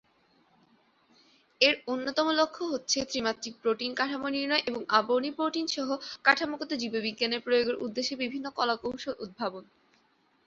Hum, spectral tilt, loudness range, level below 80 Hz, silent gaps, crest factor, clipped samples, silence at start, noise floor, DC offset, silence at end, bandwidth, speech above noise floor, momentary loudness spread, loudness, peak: none; -2 dB/octave; 3 LU; -70 dBFS; none; 24 dB; under 0.1%; 1.6 s; -68 dBFS; under 0.1%; 0.85 s; 7.8 kHz; 39 dB; 9 LU; -29 LUFS; -6 dBFS